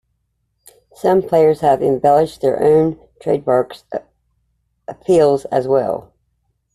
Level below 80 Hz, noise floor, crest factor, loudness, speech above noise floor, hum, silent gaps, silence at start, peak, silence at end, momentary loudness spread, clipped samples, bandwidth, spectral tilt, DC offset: -52 dBFS; -69 dBFS; 14 dB; -16 LUFS; 54 dB; none; none; 1.05 s; -2 dBFS; 0.75 s; 15 LU; under 0.1%; 13 kHz; -7.5 dB/octave; under 0.1%